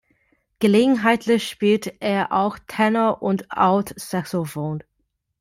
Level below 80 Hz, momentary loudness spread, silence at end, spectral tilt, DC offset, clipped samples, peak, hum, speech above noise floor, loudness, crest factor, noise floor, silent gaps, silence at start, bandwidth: -60 dBFS; 10 LU; 0.6 s; -6 dB/octave; under 0.1%; under 0.1%; -4 dBFS; none; 53 dB; -21 LUFS; 16 dB; -73 dBFS; none; 0.6 s; 16 kHz